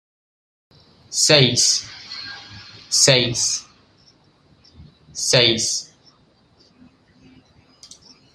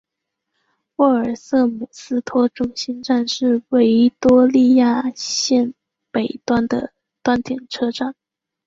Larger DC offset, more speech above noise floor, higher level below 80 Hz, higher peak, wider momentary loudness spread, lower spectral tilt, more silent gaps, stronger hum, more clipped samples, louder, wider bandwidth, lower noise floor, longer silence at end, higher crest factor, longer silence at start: neither; second, 40 dB vs 63 dB; about the same, -56 dBFS vs -52 dBFS; about the same, 0 dBFS vs -2 dBFS; first, 21 LU vs 12 LU; second, -2 dB/octave vs -4.5 dB/octave; neither; neither; neither; about the same, -16 LUFS vs -18 LUFS; first, 15 kHz vs 7.6 kHz; second, -57 dBFS vs -80 dBFS; first, 2.5 s vs 0.55 s; first, 22 dB vs 16 dB; about the same, 1.1 s vs 1 s